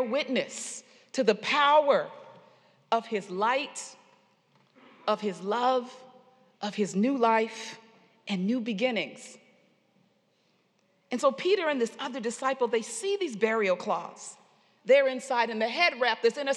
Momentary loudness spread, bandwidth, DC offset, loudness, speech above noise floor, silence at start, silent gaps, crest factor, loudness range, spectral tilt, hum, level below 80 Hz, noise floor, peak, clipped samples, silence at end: 17 LU; 12 kHz; under 0.1%; -28 LUFS; 42 dB; 0 s; none; 22 dB; 6 LU; -4 dB/octave; none; under -90 dBFS; -70 dBFS; -8 dBFS; under 0.1%; 0 s